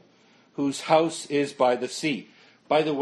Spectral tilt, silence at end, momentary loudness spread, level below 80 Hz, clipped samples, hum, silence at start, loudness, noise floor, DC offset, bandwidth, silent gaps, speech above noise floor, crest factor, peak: -4.5 dB/octave; 0 s; 8 LU; -74 dBFS; under 0.1%; none; 0.6 s; -25 LUFS; -59 dBFS; under 0.1%; 12.5 kHz; none; 34 dB; 20 dB; -6 dBFS